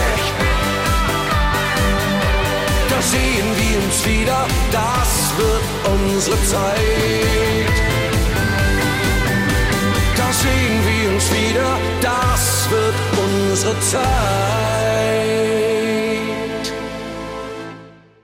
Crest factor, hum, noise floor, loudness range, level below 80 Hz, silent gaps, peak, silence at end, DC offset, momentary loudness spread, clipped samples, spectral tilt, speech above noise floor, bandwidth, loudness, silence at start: 12 dB; none; -40 dBFS; 1 LU; -24 dBFS; none; -6 dBFS; 0.35 s; under 0.1%; 3 LU; under 0.1%; -4 dB/octave; 24 dB; 16.5 kHz; -17 LUFS; 0 s